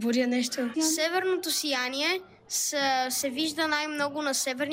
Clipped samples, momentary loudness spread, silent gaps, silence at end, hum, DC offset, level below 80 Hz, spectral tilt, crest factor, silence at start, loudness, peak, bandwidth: under 0.1%; 4 LU; none; 0 s; none; under 0.1%; -74 dBFS; -1 dB/octave; 14 dB; 0 s; -27 LUFS; -14 dBFS; 16 kHz